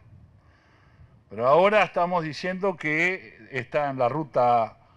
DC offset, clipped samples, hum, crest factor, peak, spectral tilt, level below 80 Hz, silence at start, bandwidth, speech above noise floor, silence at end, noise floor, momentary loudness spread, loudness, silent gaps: under 0.1%; under 0.1%; none; 18 dB; -8 dBFS; -6 dB/octave; -62 dBFS; 1.3 s; 9.6 kHz; 34 dB; 0.25 s; -57 dBFS; 13 LU; -24 LUFS; none